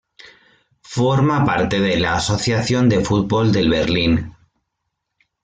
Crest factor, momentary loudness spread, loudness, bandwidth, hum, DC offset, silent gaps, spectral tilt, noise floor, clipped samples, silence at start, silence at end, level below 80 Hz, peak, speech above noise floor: 14 dB; 4 LU; -17 LUFS; 9.4 kHz; none; under 0.1%; none; -5.5 dB/octave; -76 dBFS; under 0.1%; 0.9 s; 1.15 s; -42 dBFS; -4 dBFS; 60 dB